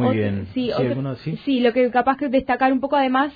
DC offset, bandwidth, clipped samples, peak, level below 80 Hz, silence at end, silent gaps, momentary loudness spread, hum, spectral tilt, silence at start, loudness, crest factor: under 0.1%; 5 kHz; under 0.1%; -6 dBFS; -52 dBFS; 0.05 s; none; 7 LU; none; -9 dB/octave; 0 s; -20 LUFS; 14 dB